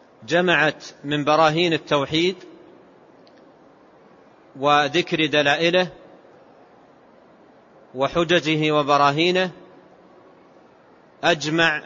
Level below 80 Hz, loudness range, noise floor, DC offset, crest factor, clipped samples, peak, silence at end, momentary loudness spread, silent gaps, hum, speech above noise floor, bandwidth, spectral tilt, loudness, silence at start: -60 dBFS; 3 LU; -52 dBFS; under 0.1%; 18 dB; under 0.1%; -4 dBFS; 0 s; 9 LU; none; none; 32 dB; 7.8 kHz; -4.5 dB/octave; -20 LUFS; 0.2 s